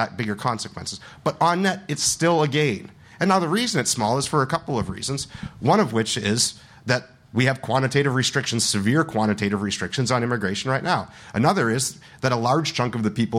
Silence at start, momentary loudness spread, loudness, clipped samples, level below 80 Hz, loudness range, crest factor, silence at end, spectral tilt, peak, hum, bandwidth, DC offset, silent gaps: 0 s; 8 LU; -22 LUFS; under 0.1%; -54 dBFS; 2 LU; 18 dB; 0 s; -4 dB/octave; -4 dBFS; none; 16 kHz; under 0.1%; none